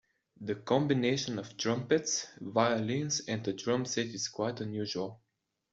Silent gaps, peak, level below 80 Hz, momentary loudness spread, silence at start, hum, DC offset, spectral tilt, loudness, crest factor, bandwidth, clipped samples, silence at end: none; -12 dBFS; -72 dBFS; 8 LU; 0.4 s; none; under 0.1%; -4 dB/octave; -32 LUFS; 20 dB; 8 kHz; under 0.1%; 0.55 s